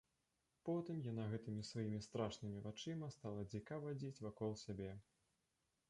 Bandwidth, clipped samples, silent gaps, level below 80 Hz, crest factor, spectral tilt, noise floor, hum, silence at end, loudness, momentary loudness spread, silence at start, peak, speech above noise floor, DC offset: 11 kHz; under 0.1%; none; -72 dBFS; 20 dB; -6.5 dB/octave; -87 dBFS; none; 0.9 s; -48 LUFS; 5 LU; 0.65 s; -28 dBFS; 40 dB; under 0.1%